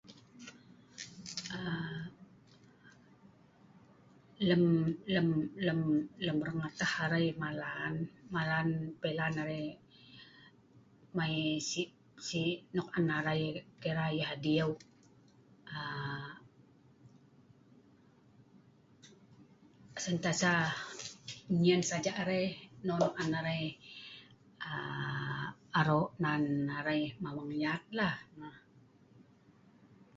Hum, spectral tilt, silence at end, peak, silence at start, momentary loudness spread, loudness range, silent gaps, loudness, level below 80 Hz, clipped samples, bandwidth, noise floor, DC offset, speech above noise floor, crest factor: none; -4.5 dB/octave; 0.95 s; -14 dBFS; 0.1 s; 18 LU; 12 LU; none; -35 LUFS; -68 dBFS; under 0.1%; 7.6 kHz; -64 dBFS; under 0.1%; 30 dB; 22 dB